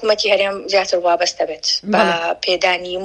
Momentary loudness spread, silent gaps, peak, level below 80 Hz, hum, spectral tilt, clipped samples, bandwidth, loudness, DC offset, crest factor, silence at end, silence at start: 4 LU; none; 0 dBFS; -56 dBFS; none; -2.5 dB/octave; under 0.1%; 10 kHz; -17 LUFS; under 0.1%; 16 dB; 0 s; 0 s